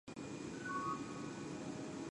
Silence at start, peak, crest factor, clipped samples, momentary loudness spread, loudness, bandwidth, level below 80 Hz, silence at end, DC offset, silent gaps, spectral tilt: 0.05 s; -30 dBFS; 14 dB; under 0.1%; 6 LU; -45 LUFS; 11.5 kHz; -70 dBFS; 0 s; under 0.1%; none; -5 dB/octave